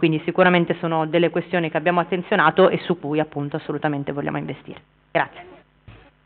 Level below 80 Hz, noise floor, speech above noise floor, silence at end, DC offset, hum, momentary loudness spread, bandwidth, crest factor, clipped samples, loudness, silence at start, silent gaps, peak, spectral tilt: -60 dBFS; -48 dBFS; 27 dB; 0.35 s; under 0.1%; none; 11 LU; 4.5 kHz; 18 dB; under 0.1%; -21 LUFS; 0 s; none; -2 dBFS; -4.5 dB/octave